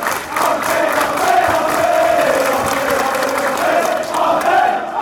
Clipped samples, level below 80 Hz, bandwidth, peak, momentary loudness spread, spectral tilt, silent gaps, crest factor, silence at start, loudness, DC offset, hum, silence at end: under 0.1%; -48 dBFS; over 20 kHz; -2 dBFS; 4 LU; -3 dB/octave; none; 12 dB; 0 s; -15 LUFS; under 0.1%; none; 0 s